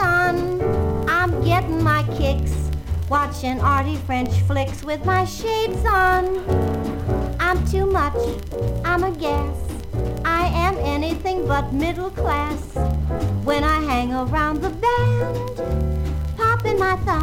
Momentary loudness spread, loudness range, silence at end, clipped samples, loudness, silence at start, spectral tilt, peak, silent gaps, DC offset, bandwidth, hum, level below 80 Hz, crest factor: 6 LU; 2 LU; 0 s; under 0.1%; -21 LUFS; 0 s; -6.5 dB/octave; -6 dBFS; none; under 0.1%; 16.5 kHz; none; -30 dBFS; 14 dB